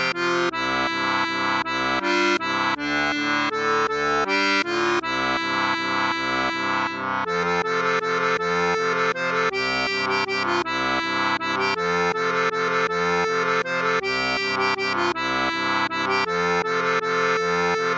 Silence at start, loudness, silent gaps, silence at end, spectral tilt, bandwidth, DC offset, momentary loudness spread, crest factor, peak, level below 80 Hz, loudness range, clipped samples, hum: 0 s; -22 LUFS; none; 0 s; -3.5 dB/octave; 8.4 kHz; under 0.1%; 2 LU; 14 dB; -10 dBFS; -56 dBFS; 1 LU; under 0.1%; none